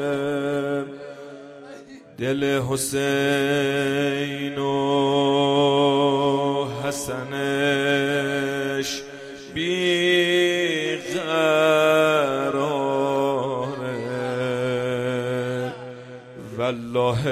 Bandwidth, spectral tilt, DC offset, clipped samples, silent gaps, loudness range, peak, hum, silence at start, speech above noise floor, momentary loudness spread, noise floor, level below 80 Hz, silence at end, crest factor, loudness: 15 kHz; -4.5 dB/octave; under 0.1%; under 0.1%; none; 6 LU; -6 dBFS; none; 0 s; 19 dB; 17 LU; -42 dBFS; -58 dBFS; 0 s; 16 dB; -22 LUFS